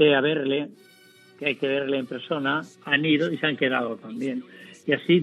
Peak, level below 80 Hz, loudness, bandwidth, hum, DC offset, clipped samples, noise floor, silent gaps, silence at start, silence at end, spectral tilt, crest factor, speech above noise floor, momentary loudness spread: -6 dBFS; -84 dBFS; -25 LUFS; 11.5 kHz; none; under 0.1%; under 0.1%; -53 dBFS; none; 0 s; 0 s; -6.5 dB/octave; 18 dB; 29 dB; 10 LU